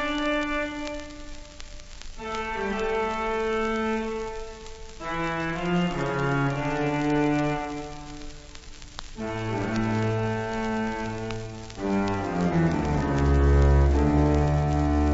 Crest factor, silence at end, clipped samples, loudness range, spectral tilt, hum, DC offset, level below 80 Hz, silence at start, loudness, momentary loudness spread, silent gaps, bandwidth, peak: 16 dB; 0 s; under 0.1%; 7 LU; -7 dB/octave; none; under 0.1%; -32 dBFS; 0 s; -26 LUFS; 20 LU; none; 8 kHz; -10 dBFS